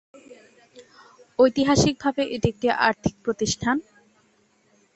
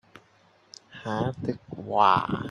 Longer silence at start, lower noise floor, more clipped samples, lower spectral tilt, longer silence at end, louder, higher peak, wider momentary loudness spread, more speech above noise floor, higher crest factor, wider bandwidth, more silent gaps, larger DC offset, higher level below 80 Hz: first, 0.75 s vs 0.15 s; about the same, -63 dBFS vs -61 dBFS; neither; second, -4.5 dB/octave vs -6.5 dB/octave; first, 1.15 s vs 0 s; about the same, -23 LUFS vs -25 LUFS; about the same, -4 dBFS vs -6 dBFS; second, 8 LU vs 17 LU; first, 41 dB vs 35 dB; about the same, 20 dB vs 22 dB; second, 8.2 kHz vs 11 kHz; neither; neither; first, -48 dBFS vs -60 dBFS